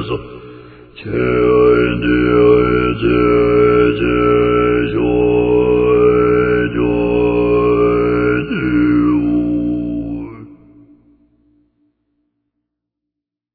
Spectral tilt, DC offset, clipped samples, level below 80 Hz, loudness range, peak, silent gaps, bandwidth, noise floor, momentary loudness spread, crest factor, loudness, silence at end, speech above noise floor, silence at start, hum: -11 dB/octave; under 0.1%; under 0.1%; -32 dBFS; 8 LU; 0 dBFS; none; 4.7 kHz; -81 dBFS; 11 LU; 14 dB; -13 LUFS; 3 s; 68 dB; 0 s; 60 Hz at -30 dBFS